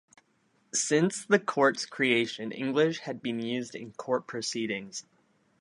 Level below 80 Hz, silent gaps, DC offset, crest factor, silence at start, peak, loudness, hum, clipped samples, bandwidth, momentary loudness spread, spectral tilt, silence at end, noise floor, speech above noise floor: -78 dBFS; none; under 0.1%; 22 dB; 0.75 s; -8 dBFS; -29 LUFS; none; under 0.1%; 11.5 kHz; 10 LU; -3.5 dB/octave; 0.6 s; -70 dBFS; 41 dB